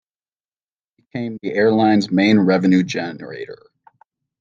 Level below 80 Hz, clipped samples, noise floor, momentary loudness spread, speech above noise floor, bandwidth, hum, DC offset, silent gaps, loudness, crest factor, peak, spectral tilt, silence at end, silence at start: -66 dBFS; under 0.1%; under -90 dBFS; 18 LU; over 73 dB; 7.4 kHz; none; under 0.1%; none; -17 LUFS; 16 dB; -4 dBFS; -6.5 dB/octave; 0.85 s; 1.15 s